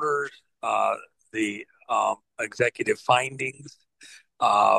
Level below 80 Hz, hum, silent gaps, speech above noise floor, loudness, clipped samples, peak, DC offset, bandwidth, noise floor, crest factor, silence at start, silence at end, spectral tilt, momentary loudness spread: -74 dBFS; none; none; 29 dB; -26 LUFS; under 0.1%; -6 dBFS; under 0.1%; 12.5 kHz; -52 dBFS; 20 dB; 0 s; 0 s; -3.5 dB/octave; 12 LU